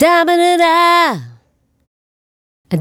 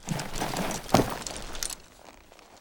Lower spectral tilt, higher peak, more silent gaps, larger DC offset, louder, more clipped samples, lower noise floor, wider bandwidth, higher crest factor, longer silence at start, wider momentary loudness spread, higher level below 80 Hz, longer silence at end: about the same, -4.5 dB/octave vs -4 dB/octave; first, 0 dBFS vs -4 dBFS; first, 1.87-2.64 s vs none; neither; first, -11 LUFS vs -30 LUFS; neither; first, -58 dBFS vs -52 dBFS; second, 17.5 kHz vs 19.5 kHz; second, 14 dB vs 28 dB; about the same, 0 s vs 0 s; second, 11 LU vs 17 LU; second, -56 dBFS vs -44 dBFS; about the same, 0 s vs 0 s